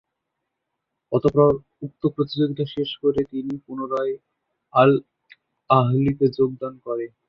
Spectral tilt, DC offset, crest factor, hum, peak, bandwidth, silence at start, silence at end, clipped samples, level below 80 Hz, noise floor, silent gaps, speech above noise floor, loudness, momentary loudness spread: -9.5 dB/octave; under 0.1%; 20 dB; none; -2 dBFS; 6 kHz; 1.1 s; 0.2 s; under 0.1%; -54 dBFS; -80 dBFS; none; 59 dB; -22 LUFS; 12 LU